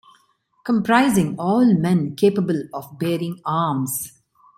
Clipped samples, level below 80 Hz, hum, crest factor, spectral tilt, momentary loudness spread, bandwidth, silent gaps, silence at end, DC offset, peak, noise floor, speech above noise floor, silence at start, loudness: under 0.1%; -60 dBFS; none; 18 dB; -6 dB/octave; 11 LU; 16.5 kHz; none; 0.5 s; under 0.1%; -2 dBFS; -62 dBFS; 43 dB; 0.65 s; -20 LUFS